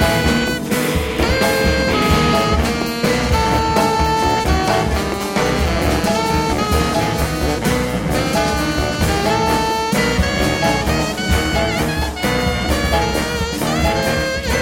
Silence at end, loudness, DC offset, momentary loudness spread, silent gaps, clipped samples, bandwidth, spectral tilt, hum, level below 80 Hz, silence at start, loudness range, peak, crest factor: 0 s; -17 LUFS; under 0.1%; 4 LU; none; under 0.1%; 16.5 kHz; -4.5 dB/octave; none; -26 dBFS; 0 s; 2 LU; -2 dBFS; 14 dB